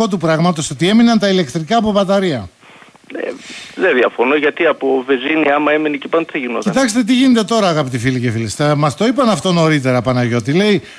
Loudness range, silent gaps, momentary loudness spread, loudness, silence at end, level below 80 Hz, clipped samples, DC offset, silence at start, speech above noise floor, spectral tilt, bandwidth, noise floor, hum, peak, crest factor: 2 LU; none; 7 LU; -14 LUFS; 0 s; -50 dBFS; under 0.1%; under 0.1%; 0 s; 29 dB; -5.5 dB/octave; 11 kHz; -42 dBFS; none; -2 dBFS; 12 dB